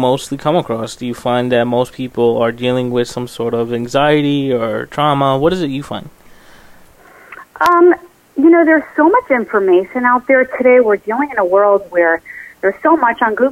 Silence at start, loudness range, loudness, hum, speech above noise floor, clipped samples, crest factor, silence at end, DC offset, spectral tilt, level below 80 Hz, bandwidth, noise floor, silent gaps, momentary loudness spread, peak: 0 s; 5 LU; -14 LUFS; none; 29 dB; under 0.1%; 14 dB; 0 s; under 0.1%; -6 dB/octave; -48 dBFS; 15.5 kHz; -42 dBFS; none; 10 LU; 0 dBFS